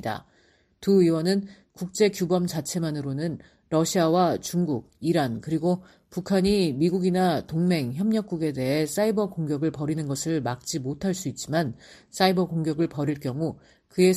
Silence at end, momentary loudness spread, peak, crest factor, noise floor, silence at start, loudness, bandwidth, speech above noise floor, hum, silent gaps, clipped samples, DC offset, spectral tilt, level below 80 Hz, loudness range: 0 s; 10 LU; -8 dBFS; 18 dB; -62 dBFS; 0.05 s; -25 LUFS; 15 kHz; 37 dB; none; none; under 0.1%; under 0.1%; -6 dB/octave; -56 dBFS; 3 LU